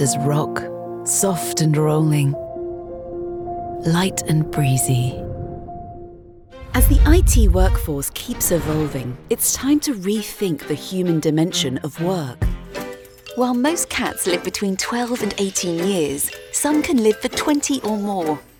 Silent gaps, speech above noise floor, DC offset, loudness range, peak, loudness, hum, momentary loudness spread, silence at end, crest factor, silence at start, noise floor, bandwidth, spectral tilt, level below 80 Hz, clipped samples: none; 23 dB; under 0.1%; 3 LU; -2 dBFS; -20 LUFS; none; 13 LU; 0.15 s; 18 dB; 0 s; -41 dBFS; 19.5 kHz; -5 dB/octave; -26 dBFS; under 0.1%